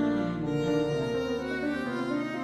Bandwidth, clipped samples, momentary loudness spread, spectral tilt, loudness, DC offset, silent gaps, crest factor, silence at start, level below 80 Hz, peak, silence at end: 12.5 kHz; under 0.1%; 3 LU; -7 dB/octave; -30 LUFS; under 0.1%; none; 12 dB; 0 s; -54 dBFS; -16 dBFS; 0 s